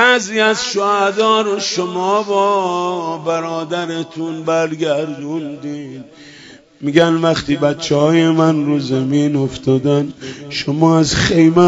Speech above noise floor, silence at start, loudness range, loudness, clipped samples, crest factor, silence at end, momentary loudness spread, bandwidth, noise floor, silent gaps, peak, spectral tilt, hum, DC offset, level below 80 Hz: 26 dB; 0 s; 6 LU; -16 LUFS; under 0.1%; 16 dB; 0 s; 12 LU; 8 kHz; -41 dBFS; none; 0 dBFS; -5 dB/octave; none; under 0.1%; -46 dBFS